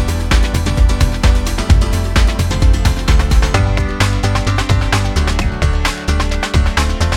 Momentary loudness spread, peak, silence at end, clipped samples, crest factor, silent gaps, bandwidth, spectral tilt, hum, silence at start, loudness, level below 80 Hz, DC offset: 3 LU; 0 dBFS; 0 s; under 0.1%; 12 dB; none; 15 kHz; -5 dB/octave; none; 0 s; -15 LUFS; -14 dBFS; under 0.1%